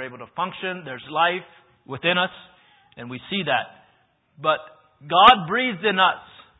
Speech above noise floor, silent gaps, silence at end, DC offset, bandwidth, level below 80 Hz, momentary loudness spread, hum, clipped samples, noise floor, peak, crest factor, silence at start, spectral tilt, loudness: 41 dB; none; 0.4 s; under 0.1%; 8 kHz; -58 dBFS; 21 LU; none; under 0.1%; -63 dBFS; 0 dBFS; 24 dB; 0 s; -6.5 dB/octave; -21 LUFS